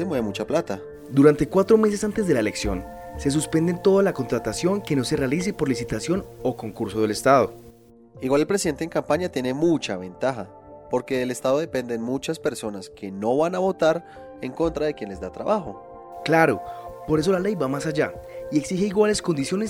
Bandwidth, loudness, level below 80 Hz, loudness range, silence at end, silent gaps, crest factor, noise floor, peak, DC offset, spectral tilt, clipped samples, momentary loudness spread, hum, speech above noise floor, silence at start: 17 kHz; -23 LUFS; -48 dBFS; 4 LU; 0 s; none; 20 dB; -49 dBFS; -4 dBFS; under 0.1%; -5.5 dB/octave; under 0.1%; 14 LU; none; 26 dB; 0 s